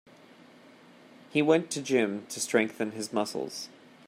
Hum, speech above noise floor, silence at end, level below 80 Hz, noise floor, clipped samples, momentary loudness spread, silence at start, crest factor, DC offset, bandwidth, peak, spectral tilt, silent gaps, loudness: none; 26 dB; 0.4 s; -80 dBFS; -54 dBFS; under 0.1%; 11 LU; 1.3 s; 20 dB; under 0.1%; 16 kHz; -10 dBFS; -4 dB/octave; none; -29 LUFS